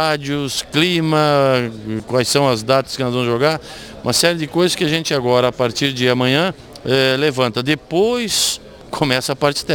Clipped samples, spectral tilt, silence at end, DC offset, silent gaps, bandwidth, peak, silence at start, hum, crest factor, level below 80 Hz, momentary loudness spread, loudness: under 0.1%; -4 dB/octave; 0 s; under 0.1%; none; 19 kHz; 0 dBFS; 0 s; none; 16 dB; -48 dBFS; 7 LU; -17 LUFS